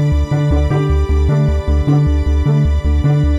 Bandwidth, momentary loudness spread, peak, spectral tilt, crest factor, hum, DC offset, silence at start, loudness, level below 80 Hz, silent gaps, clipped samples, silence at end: 7.4 kHz; 2 LU; -2 dBFS; -8.5 dB/octave; 10 dB; none; under 0.1%; 0 s; -15 LUFS; -16 dBFS; none; under 0.1%; 0 s